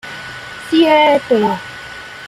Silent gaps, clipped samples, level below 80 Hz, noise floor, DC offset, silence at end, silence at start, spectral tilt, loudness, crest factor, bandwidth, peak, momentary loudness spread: none; under 0.1%; -54 dBFS; -31 dBFS; under 0.1%; 0 s; 0.05 s; -5 dB/octave; -13 LUFS; 14 dB; 13.5 kHz; -2 dBFS; 19 LU